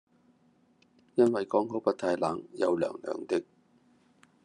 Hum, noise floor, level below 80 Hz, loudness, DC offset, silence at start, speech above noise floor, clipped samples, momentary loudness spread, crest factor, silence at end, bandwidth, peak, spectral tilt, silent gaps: none; -66 dBFS; -78 dBFS; -30 LUFS; under 0.1%; 1.15 s; 37 dB; under 0.1%; 7 LU; 20 dB; 1.05 s; 10.5 kHz; -10 dBFS; -6.5 dB/octave; none